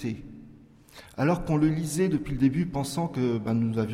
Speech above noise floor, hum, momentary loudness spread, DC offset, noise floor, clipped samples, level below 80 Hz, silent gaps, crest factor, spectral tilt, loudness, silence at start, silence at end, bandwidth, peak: 26 dB; none; 11 LU; under 0.1%; -52 dBFS; under 0.1%; -48 dBFS; none; 16 dB; -7 dB/octave; -27 LUFS; 0 s; 0 s; 15.5 kHz; -12 dBFS